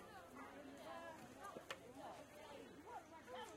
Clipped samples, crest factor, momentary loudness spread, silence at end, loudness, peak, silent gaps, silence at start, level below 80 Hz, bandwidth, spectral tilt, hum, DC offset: under 0.1%; 22 dB; 4 LU; 0 s; -56 LUFS; -34 dBFS; none; 0 s; -80 dBFS; 16 kHz; -3.5 dB/octave; none; under 0.1%